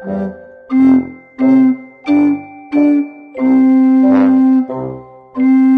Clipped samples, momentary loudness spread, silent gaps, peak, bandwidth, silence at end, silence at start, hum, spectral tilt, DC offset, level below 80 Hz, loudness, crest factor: under 0.1%; 15 LU; none; 0 dBFS; 4.6 kHz; 0 s; 0 s; none; -9 dB/octave; under 0.1%; -54 dBFS; -12 LUFS; 12 dB